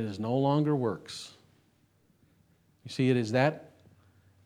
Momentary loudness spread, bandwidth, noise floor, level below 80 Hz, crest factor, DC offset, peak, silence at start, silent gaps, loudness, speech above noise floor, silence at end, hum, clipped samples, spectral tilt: 16 LU; 12 kHz; -67 dBFS; -76 dBFS; 22 dB; under 0.1%; -10 dBFS; 0 s; none; -29 LUFS; 39 dB; 0.8 s; none; under 0.1%; -7 dB/octave